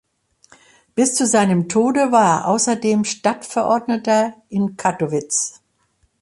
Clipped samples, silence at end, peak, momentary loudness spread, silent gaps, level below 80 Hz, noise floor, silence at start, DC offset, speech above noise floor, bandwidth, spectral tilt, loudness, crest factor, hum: under 0.1%; 0.7 s; -2 dBFS; 8 LU; none; -62 dBFS; -64 dBFS; 0.95 s; under 0.1%; 46 dB; 11.5 kHz; -4.5 dB/octave; -18 LUFS; 16 dB; none